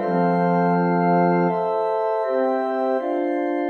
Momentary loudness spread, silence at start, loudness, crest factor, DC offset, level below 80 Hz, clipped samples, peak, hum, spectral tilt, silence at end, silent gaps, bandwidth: 4 LU; 0 s; -21 LUFS; 12 dB; under 0.1%; -74 dBFS; under 0.1%; -8 dBFS; none; -10 dB/octave; 0 s; none; 4.4 kHz